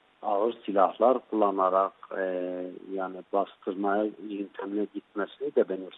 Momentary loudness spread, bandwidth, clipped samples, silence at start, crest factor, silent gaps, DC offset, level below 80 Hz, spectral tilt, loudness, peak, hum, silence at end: 11 LU; 4.1 kHz; under 0.1%; 0.2 s; 20 dB; none; under 0.1%; -80 dBFS; -9 dB/octave; -29 LUFS; -8 dBFS; none; 0 s